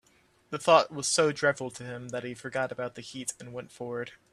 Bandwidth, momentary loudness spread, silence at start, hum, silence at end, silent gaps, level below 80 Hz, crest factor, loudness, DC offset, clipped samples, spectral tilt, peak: 14 kHz; 17 LU; 0.5 s; none; 0.15 s; none; -70 dBFS; 24 dB; -29 LUFS; under 0.1%; under 0.1%; -3 dB/octave; -6 dBFS